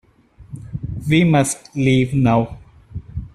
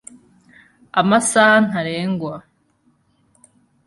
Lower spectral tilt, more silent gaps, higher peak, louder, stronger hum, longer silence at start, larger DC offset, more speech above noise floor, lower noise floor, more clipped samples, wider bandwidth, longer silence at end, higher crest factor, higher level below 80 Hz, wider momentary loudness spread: first, -6 dB/octave vs -4 dB/octave; neither; about the same, -2 dBFS vs -2 dBFS; about the same, -17 LUFS vs -16 LUFS; neither; second, 0.4 s vs 0.95 s; neither; second, 31 dB vs 45 dB; second, -47 dBFS vs -61 dBFS; neither; first, 13 kHz vs 11.5 kHz; second, 0.1 s vs 1.45 s; about the same, 16 dB vs 18 dB; first, -40 dBFS vs -62 dBFS; first, 21 LU vs 14 LU